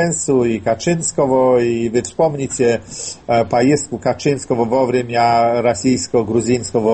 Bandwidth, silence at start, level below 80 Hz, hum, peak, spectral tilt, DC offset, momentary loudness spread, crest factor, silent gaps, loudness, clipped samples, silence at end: 8.8 kHz; 0 s; -48 dBFS; none; -2 dBFS; -5 dB/octave; under 0.1%; 5 LU; 14 dB; none; -16 LUFS; under 0.1%; 0 s